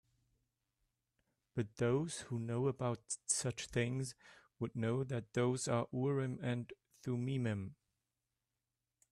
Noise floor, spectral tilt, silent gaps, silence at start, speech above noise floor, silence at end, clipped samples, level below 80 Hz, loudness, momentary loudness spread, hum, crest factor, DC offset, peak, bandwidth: under -90 dBFS; -5.5 dB/octave; none; 1.55 s; over 52 dB; 1.4 s; under 0.1%; -70 dBFS; -39 LUFS; 9 LU; none; 18 dB; under 0.1%; -22 dBFS; 12.5 kHz